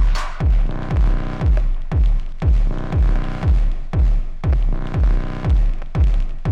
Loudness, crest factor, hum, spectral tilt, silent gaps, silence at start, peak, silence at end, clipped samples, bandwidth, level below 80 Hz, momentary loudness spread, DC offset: -21 LUFS; 8 dB; none; -8 dB/octave; none; 0 s; -8 dBFS; 0 s; under 0.1%; 6.6 kHz; -16 dBFS; 3 LU; under 0.1%